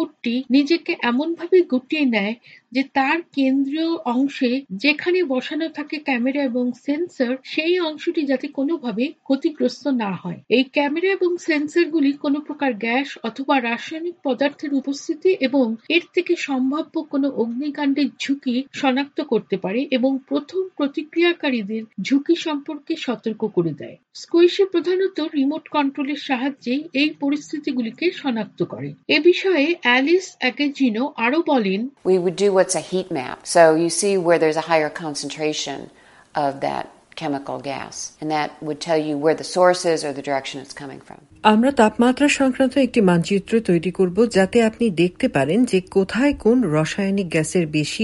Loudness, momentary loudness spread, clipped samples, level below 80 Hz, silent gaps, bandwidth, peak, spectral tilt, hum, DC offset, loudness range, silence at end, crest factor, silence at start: -20 LUFS; 10 LU; under 0.1%; -56 dBFS; none; 11.5 kHz; 0 dBFS; -5 dB/octave; none; under 0.1%; 4 LU; 0 s; 20 dB; 0 s